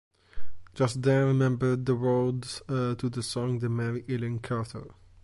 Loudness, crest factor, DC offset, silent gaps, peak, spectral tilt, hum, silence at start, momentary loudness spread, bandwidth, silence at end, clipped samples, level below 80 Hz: -28 LUFS; 16 dB; under 0.1%; none; -12 dBFS; -7 dB/octave; none; 0.1 s; 9 LU; 11.5 kHz; 0.05 s; under 0.1%; -56 dBFS